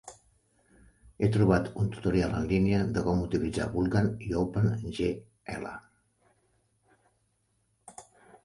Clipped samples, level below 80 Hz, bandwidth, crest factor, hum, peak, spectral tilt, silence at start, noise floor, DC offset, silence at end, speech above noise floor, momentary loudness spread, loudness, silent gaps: under 0.1%; -48 dBFS; 11.5 kHz; 20 dB; none; -10 dBFS; -7.5 dB/octave; 0.05 s; -73 dBFS; under 0.1%; 0.45 s; 46 dB; 16 LU; -29 LUFS; none